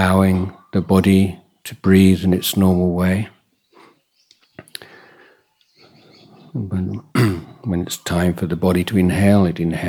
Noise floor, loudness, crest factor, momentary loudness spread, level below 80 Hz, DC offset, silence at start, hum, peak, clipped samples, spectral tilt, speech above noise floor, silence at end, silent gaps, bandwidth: -58 dBFS; -17 LUFS; 18 dB; 17 LU; -46 dBFS; under 0.1%; 0 s; none; 0 dBFS; under 0.1%; -6.5 dB/octave; 42 dB; 0 s; none; 17 kHz